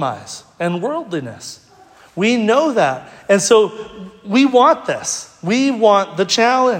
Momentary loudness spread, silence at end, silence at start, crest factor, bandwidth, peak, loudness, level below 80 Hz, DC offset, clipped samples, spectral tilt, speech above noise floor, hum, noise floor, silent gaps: 20 LU; 0 s; 0 s; 16 dB; 16 kHz; 0 dBFS; -16 LUFS; -62 dBFS; under 0.1%; under 0.1%; -4 dB/octave; 31 dB; none; -46 dBFS; none